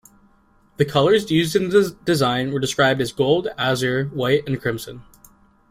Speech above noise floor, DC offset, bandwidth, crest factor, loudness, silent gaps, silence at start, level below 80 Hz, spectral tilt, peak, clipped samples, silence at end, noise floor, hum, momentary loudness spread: 37 dB; under 0.1%; 16 kHz; 16 dB; -20 LUFS; none; 0.8 s; -52 dBFS; -5 dB/octave; -4 dBFS; under 0.1%; 0.7 s; -57 dBFS; none; 7 LU